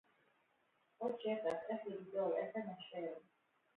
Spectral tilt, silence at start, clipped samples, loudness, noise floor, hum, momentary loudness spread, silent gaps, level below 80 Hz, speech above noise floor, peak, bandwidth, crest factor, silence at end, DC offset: -4 dB/octave; 1 s; under 0.1%; -43 LUFS; -79 dBFS; none; 8 LU; none; -90 dBFS; 36 dB; -28 dBFS; 4 kHz; 18 dB; 0.55 s; under 0.1%